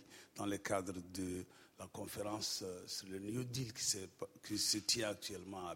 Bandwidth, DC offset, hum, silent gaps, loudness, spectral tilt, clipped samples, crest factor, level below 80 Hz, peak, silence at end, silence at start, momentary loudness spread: 16.5 kHz; under 0.1%; none; none; -41 LUFS; -3 dB/octave; under 0.1%; 22 dB; -72 dBFS; -22 dBFS; 0 s; 0 s; 15 LU